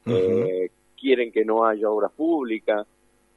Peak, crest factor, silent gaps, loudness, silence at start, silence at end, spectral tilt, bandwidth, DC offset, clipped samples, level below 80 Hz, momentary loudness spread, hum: -6 dBFS; 16 dB; none; -23 LUFS; 0.05 s; 0.55 s; -7.5 dB/octave; 7 kHz; under 0.1%; under 0.1%; -66 dBFS; 8 LU; none